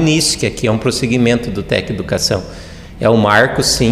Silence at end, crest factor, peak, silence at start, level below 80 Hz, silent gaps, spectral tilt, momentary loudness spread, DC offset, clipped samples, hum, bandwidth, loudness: 0 s; 14 dB; 0 dBFS; 0 s; -34 dBFS; none; -4 dB/octave; 9 LU; 0.3%; under 0.1%; none; 16 kHz; -14 LUFS